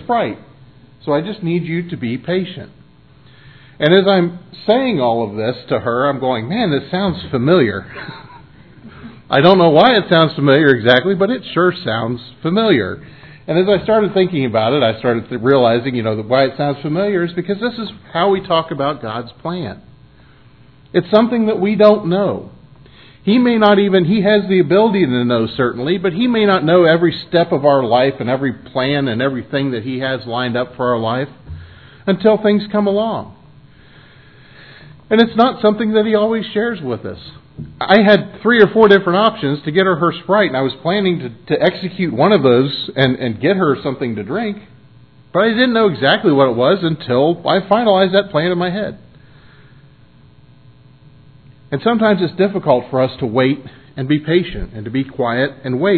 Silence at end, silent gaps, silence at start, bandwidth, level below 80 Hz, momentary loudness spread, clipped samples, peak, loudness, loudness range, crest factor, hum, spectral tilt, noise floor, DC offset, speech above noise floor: 0 s; none; 0 s; 5.4 kHz; -48 dBFS; 13 LU; under 0.1%; 0 dBFS; -15 LUFS; 6 LU; 16 dB; none; -9 dB/octave; -46 dBFS; 0.2%; 32 dB